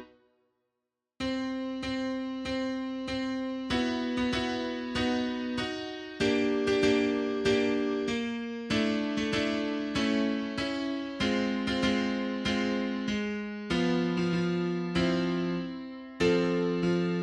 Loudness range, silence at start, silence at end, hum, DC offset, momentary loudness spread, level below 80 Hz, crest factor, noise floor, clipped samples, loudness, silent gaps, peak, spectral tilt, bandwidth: 4 LU; 0 s; 0 s; none; under 0.1%; 7 LU; -54 dBFS; 16 dB; -86 dBFS; under 0.1%; -30 LUFS; none; -14 dBFS; -5.5 dB/octave; 10.5 kHz